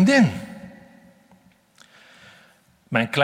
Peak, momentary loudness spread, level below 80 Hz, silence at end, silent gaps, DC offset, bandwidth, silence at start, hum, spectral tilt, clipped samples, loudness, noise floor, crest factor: -2 dBFS; 25 LU; -64 dBFS; 0 s; none; under 0.1%; 15.5 kHz; 0 s; none; -6 dB/octave; under 0.1%; -21 LUFS; -57 dBFS; 22 dB